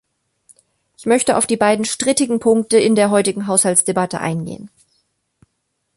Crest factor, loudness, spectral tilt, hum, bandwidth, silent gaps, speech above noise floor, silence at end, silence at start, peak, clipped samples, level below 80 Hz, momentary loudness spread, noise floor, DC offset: 18 dB; -16 LUFS; -3.5 dB/octave; none; 12 kHz; none; 55 dB; 1.3 s; 1 s; 0 dBFS; under 0.1%; -58 dBFS; 10 LU; -71 dBFS; under 0.1%